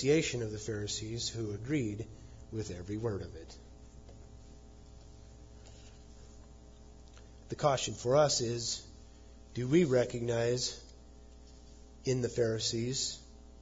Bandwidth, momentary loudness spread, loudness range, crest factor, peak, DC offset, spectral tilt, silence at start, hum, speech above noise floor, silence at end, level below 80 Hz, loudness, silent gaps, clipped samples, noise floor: 7.6 kHz; 26 LU; 23 LU; 20 dB; -16 dBFS; under 0.1%; -5 dB/octave; 0 s; none; 21 dB; 0 s; -54 dBFS; -33 LUFS; none; under 0.1%; -54 dBFS